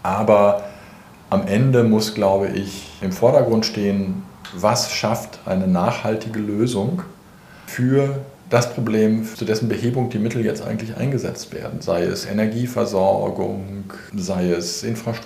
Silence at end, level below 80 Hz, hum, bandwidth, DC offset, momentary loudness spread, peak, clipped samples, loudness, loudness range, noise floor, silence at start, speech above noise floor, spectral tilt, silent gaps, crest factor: 0 s; -54 dBFS; none; 15.5 kHz; under 0.1%; 13 LU; -2 dBFS; under 0.1%; -20 LUFS; 4 LU; -44 dBFS; 0.05 s; 25 dB; -6 dB/octave; none; 18 dB